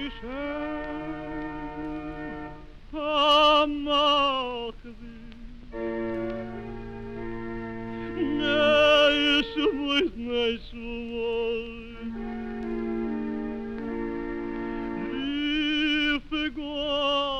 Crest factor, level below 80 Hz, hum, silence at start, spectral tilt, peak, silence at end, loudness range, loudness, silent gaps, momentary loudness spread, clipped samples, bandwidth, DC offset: 18 dB; -46 dBFS; none; 0 s; -4.5 dB/octave; -10 dBFS; 0 s; 10 LU; -26 LUFS; none; 18 LU; under 0.1%; 10 kHz; 0.3%